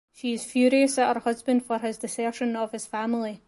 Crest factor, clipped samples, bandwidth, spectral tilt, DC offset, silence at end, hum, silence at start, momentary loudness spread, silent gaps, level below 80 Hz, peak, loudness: 16 dB; under 0.1%; 11.5 kHz; -3.5 dB/octave; under 0.1%; 0.1 s; none; 0.2 s; 10 LU; none; -70 dBFS; -10 dBFS; -26 LUFS